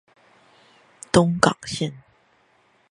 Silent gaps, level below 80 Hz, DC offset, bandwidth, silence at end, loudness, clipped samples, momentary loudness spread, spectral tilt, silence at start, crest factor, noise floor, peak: none; -52 dBFS; under 0.1%; 11.5 kHz; 0.9 s; -21 LUFS; under 0.1%; 12 LU; -5 dB/octave; 1.15 s; 24 dB; -61 dBFS; 0 dBFS